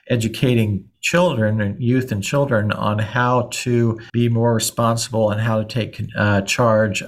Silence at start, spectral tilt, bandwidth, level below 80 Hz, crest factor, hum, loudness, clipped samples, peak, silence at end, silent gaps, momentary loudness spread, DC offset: 0.05 s; -5.5 dB/octave; 15.5 kHz; -50 dBFS; 16 dB; none; -19 LUFS; under 0.1%; -4 dBFS; 0 s; none; 4 LU; under 0.1%